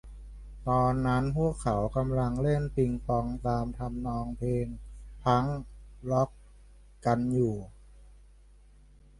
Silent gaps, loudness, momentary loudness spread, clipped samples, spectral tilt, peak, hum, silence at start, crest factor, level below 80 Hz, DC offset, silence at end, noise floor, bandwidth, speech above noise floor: none; -30 LUFS; 15 LU; under 0.1%; -8 dB/octave; -10 dBFS; 50 Hz at -45 dBFS; 0.05 s; 20 dB; -44 dBFS; under 0.1%; 1.05 s; -56 dBFS; 11.5 kHz; 27 dB